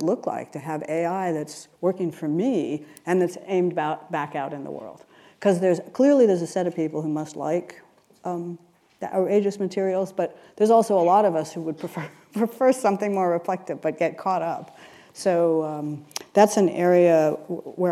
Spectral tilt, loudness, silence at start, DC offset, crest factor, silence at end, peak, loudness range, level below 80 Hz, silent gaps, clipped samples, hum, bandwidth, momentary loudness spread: -6.5 dB/octave; -23 LUFS; 0 s; under 0.1%; 20 dB; 0 s; -4 dBFS; 5 LU; -78 dBFS; none; under 0.1%; none; 14.5 kHz; 14 LU